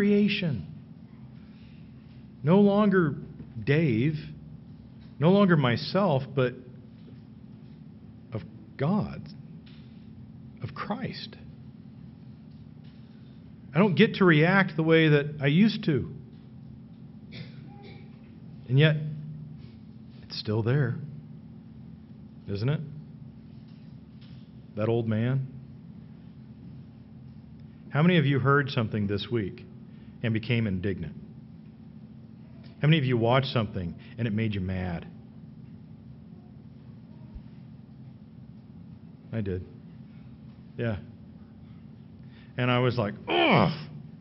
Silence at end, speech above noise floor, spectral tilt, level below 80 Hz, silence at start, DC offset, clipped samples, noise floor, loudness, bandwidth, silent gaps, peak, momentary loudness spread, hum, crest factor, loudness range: 0 s; 23 dB; -5.5 dB/octave; -58 dBFS; 0 s; under 0.1%; under 0.1%; -48 dBFS; -26 LUFS; 5.8 kHz; none; -6 dBFS; 26 LU; none; 24 dB; 16 LU